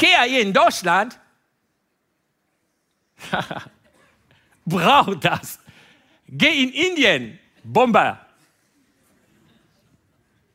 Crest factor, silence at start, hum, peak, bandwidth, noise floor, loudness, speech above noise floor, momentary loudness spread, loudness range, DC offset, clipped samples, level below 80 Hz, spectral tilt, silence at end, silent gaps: 20 dB; 0 s; none; 0 dBFS; 16 kHz; -71 dBFS; -18 LUFS; 53 dB; 21 LU; 13 LU; under 0.1%; under 0.1%; -60 dBFS; -4 dB/octave; 2.4 s; none